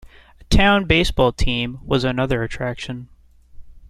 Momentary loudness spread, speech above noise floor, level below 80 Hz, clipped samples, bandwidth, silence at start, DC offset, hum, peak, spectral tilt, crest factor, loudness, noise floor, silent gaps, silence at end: 12 LU; 21 dB; -28 dBFS; under 0.1%; 13.5 kHz; 0.05 s; under 0.1%; none; -2 dBFS; -5.5 dB/octave; 18 dB; -19 LUFS; -40 dBFS; none; 0.1 s